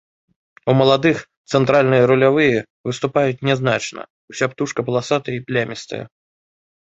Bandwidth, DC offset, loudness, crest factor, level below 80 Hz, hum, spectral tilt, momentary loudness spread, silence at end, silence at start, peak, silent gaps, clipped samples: 8 kHz; under 0.1%; -18 LUFS; 18 dB; -56 dBFS; none; -6 dB/octave; 14 LU; 0.75 s; 0.65 s; -2 dBFS; 1.37-1.45 s, 2.70-2.84 s, 4.10-4.28 s; under 0.1%